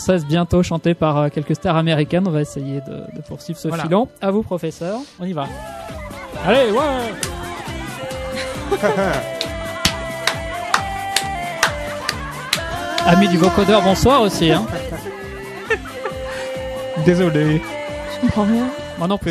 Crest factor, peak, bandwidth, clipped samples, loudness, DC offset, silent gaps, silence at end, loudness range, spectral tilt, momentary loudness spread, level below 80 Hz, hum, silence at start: 18 dB; 0 dBFS; 14 kHz; under 0.1%; -19 LUFS; under 0.1%; none; 0 s; 6 LU; -5 dB/octave; 14 LU; -38 dBFS; none; 0 s